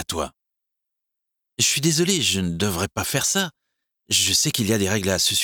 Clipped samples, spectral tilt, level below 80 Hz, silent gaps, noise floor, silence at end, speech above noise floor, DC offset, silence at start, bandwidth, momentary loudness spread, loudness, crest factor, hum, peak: under 0.1%; -2.5 dB/octave; -50 dBFS; none; -82 dBFS; 0 s; 60 dB; under 0.1%; 0 s; over 20 kHz; 10 LU; -20 LUFS; 18 dB; none; -4 dBFS